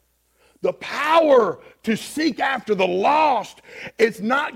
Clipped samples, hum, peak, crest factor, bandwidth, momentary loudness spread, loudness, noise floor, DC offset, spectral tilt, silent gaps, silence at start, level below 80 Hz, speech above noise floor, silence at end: under 0.1%; none; -4 dBFS; 16 dB; 16.5 kHz; 11 LU; -20 LUFS; -61 dBFS; under 0.1%; -4.5 dB/octave; none; 0.65 s; -64 dBFS; 41 dB; 0 s